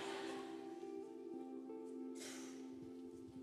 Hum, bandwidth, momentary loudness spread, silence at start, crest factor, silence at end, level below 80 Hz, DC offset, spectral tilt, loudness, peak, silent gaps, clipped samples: none; 14.5 kHz; 6 LU; 0 s; 14 dB; 0 s; -88 dBFS; under 0.1%; -3.5 dB/octave; -51 LUFS; -36 dBFS; none; under 0.1%